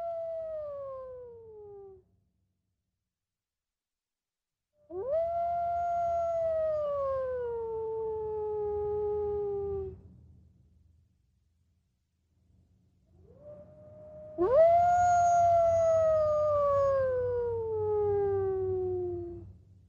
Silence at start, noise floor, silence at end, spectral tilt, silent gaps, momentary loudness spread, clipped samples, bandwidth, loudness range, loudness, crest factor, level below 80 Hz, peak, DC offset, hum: 0 s; under -90 dBFS; 0.3 s; -7 dB/octave; none; 20 LU; under 0.1%; 7.2 kHz; 17 LU; -29 LUFS; 16 dB; -56 dBFS; -14 dBFS; under 0.1%; none